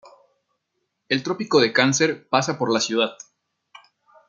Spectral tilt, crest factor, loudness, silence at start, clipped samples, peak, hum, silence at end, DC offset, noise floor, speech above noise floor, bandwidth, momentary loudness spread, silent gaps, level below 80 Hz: -3.5 dB/octave; 22 dB; -21 LUFS; 0.05 s; under 0.1%; -2 dBFS; none; 1.15 s; under 0.1%; -76 dBFS; 56 dB; 9.4 kHz; 7 LU; none; -72 dBFS